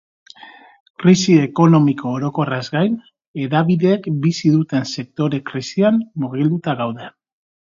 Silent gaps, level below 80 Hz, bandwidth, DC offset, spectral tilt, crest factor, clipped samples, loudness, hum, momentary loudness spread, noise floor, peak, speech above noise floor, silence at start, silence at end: 0.80-0.94 s, 3.27-3.34 s; -60 dBFS; 7.6 kHz; under 0.1%; -6.5 dB/octave; 18 dB; under 0.1%; -17 LUFS; none; 12 LU; -42 dBFS; 0 dBFS; 26 dB; 0.45 s; 0.65 s